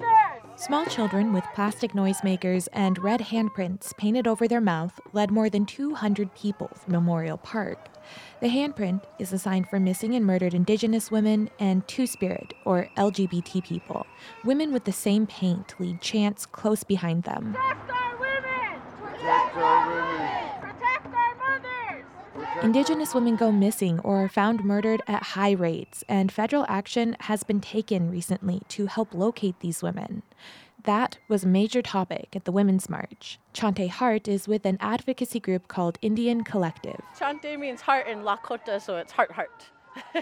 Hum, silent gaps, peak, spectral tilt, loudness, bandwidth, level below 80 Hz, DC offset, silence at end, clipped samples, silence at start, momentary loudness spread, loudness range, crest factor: none; none; -6 dBFS; -6 dB/octave; -26 LUFS; 15.5 kHz; -66 dBFS; under 0.1%; 0 s; under 0.1%; 0 s; 10 LU; 4 LU; 18 dB